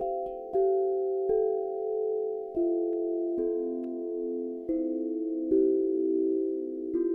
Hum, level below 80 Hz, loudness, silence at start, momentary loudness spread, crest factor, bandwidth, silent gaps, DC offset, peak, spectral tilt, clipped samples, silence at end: none; -62 dBFS; -30 LUFS; 0 s; 7 LU; 14 dB; 2.1 kHz; none; under 0.1%; -16 dBFS; -11 dB/octave; under 0.1%; 0 s